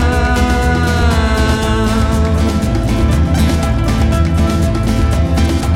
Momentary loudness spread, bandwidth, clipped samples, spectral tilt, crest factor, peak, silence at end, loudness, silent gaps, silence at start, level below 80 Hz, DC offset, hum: 2 LU; 15 kHz; under 0.1%; -6 dB/octave; 10 dB; -2 dBFS; 0 s; -14 LUFS; none; 0 s; -16 dBFS; under 0.1%; none